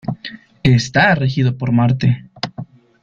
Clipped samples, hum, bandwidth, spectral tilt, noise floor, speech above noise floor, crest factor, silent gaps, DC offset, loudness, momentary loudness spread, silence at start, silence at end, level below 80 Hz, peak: under 0.1%; none; 7.4 kHz; -6.5 dB/octave; -36 dBFS; 22 dB; 16 dB; none; under 0.1%; -16 LUFS; 15 LU; 0.05 s; 0.4 s; -46 dBFS; -2 dBFS